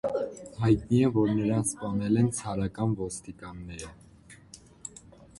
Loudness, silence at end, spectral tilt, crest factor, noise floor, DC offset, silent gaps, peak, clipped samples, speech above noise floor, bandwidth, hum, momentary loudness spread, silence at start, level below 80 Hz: -28 LUFS; 0.15 s; -6.5 dB/octave; 18 dB; -53 dBFS; under 0.1%; none; -10 dBFS; under 0.1%; 26 dB; 11.5 kHz; none; 19 LU; 0.05 s; -52 dBFS